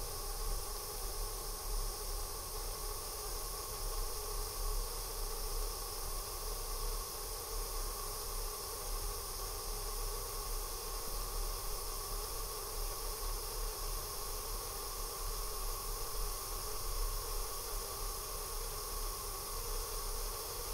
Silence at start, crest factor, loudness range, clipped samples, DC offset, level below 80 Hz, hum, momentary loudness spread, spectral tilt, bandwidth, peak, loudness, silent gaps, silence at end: 0 s; 14 dB; 0 LU; under 0.1%; under 0.1%; -42 dBFS; none; 1 LU; -2 dB/octave; 16 kHz; -26 dBFS; -41 LUFS; none; 0 s